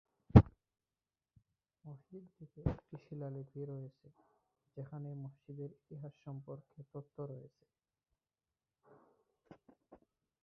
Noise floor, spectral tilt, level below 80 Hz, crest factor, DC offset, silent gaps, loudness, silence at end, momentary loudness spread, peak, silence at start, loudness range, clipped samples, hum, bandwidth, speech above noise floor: under -90 dBFS; -10 dB/octave; -50 dBFS; 32 dB; under 0.1%; none; -36 LUFS; 0.5 s; 28 LU; -8 dBFS; 0.35 s; 12 LU; under 0.1%; none; 6 kHz; over 43 dB